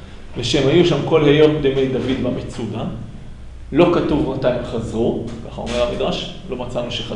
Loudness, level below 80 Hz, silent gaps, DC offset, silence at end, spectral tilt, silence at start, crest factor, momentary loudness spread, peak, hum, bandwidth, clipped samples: -18 LUFS; -36 dBFS; none; under 0.1%; 0 s; -6.5 dB/octave; 0 s; 18 dB; 15 LU; 0 dBFS; none; 10.5 kHz; under 0.1%